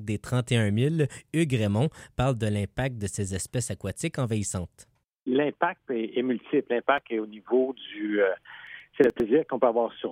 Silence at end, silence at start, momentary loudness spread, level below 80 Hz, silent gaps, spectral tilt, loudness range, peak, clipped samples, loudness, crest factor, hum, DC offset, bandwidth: 0 s; 0 s; 8 LU; -54 dBFS; 5.04-5.08 s; -6 dB/octave; 3 LU; -6 dBFS; under 0.1%; -27 LUFS; 20 dB; none; under 0.1%; 16 kHz